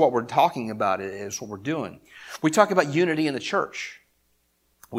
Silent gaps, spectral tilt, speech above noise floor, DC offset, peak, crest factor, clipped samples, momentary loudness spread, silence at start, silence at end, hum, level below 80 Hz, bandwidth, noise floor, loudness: none; -5 dB/octave; 44 dB; under 0.1%; -2 dBFS; 24 dB; under 0.1%; 15 LU; 0 s; 0 s; none; -68 dBFS; 16 kHz; -68 dBFS; -24 LUFS